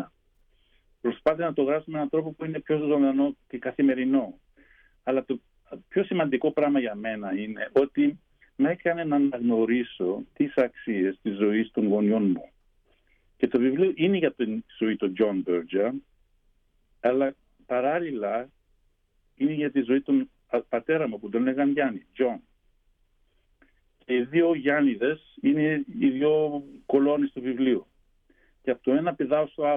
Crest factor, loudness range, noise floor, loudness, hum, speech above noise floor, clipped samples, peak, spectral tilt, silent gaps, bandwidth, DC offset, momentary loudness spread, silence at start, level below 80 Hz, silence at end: 16 dB; 3 LU; -68 dBFS; -26 LUFS; none; 43 dB; under 0.1%; -10 dBFS; -9.5 dB/octave; none; 3.8 kHz; under 0.1%; 8 LU; 0 s; -66 dBFS; 0 s